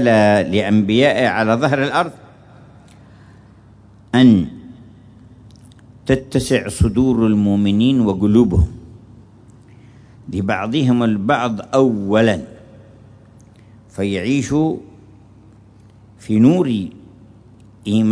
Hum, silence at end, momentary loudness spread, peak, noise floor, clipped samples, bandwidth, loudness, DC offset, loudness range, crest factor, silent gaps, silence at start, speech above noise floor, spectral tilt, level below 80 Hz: none; 0 s; 13 LU; -2 dBFS; -45 dBFS; under 0.1%; 11 kHz; -16 LUFS; under 0.1%; 5 LU; 16 dB; none; 0 s; 30 dB; -6.5 dB/octave; -36 dBFS